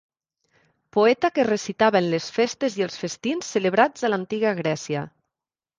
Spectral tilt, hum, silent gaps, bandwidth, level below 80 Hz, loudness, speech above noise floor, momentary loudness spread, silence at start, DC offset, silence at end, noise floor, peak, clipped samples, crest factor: -4.5 dB/octave; none; none; 9.8 kHz; -66 dBFS; -23 LUFS; 67 dB; 8 LU; 0.95 s; under 0.1%; 0.7 s; -89 dBFS; -4 dBFS; under 0.1%; 20 dB